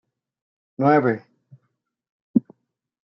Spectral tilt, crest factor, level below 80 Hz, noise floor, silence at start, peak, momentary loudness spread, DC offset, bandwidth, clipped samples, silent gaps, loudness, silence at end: -7.5 dB/octave; 20 dB; -74 dBFS; -75 dBFS; 0.8 s; -4 dBFS; 7 LU; under 0.1%; 5.8 kHz; under 0.1%; 2.09-2.34 s; -21 LUFS; 0.65 s